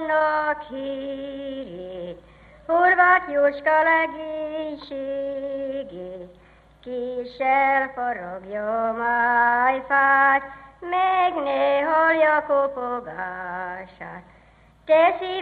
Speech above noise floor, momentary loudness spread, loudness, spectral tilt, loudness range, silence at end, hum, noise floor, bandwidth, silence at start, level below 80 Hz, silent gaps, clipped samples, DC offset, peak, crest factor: 31 dB; 18 LU; -21 LUFS; -6.5 dB/octave; 6 LU; 0 s; 50 Hz at -65 dBFS; -54 dBFS; 4.9 kHz; 0 s; -58 dBFS; none; under 0.1%; under 0.1%; -6 dBFS; 18 dB